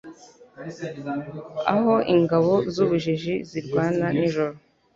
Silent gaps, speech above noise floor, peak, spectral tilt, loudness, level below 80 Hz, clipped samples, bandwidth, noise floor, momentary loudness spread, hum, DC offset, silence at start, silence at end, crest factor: none; 24 dB; -4 dBFS; -7.5 dB/octave; -23 LUFS; -60 dBFS; under 0.1%; 7.6 kHz; -46 dBFS; 15 LU; none; under 0.1%; 0.05 s; 0.4 s; 18 dB